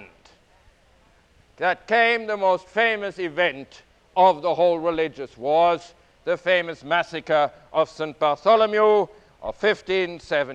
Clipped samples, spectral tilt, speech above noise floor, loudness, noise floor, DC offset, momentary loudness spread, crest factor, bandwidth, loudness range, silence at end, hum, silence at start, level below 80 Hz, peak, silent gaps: under 0.1%; -5 dB/octave; 36 dB; -22 LUFS; -57 dBFS; under 0.1%; 10 LU; 18 dB; 9 kHz; 2 LU; 0 s; none; 0 s; -58 dBFS; -6 dBFS; none